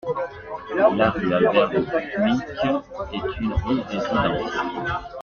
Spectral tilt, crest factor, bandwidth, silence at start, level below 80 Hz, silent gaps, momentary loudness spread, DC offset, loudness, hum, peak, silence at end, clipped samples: -7 dB/octave; 18 dB; 7 kHz; 0.05 s; -40 dBFS; none; 10 LU; under 0.1%; -23 LUFS; none; -4 dBFS; 0 s; under 0.1%